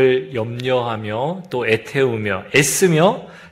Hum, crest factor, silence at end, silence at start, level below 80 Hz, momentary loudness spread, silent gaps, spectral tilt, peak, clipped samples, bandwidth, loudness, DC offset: none; 18 dB; 0 s; 0 s; -56 dBFS; 9 LU; none; -4.5 dB/octave; 0 dBFS; under 0.1%; 16 kHz; -18 LUFS; under 0.1%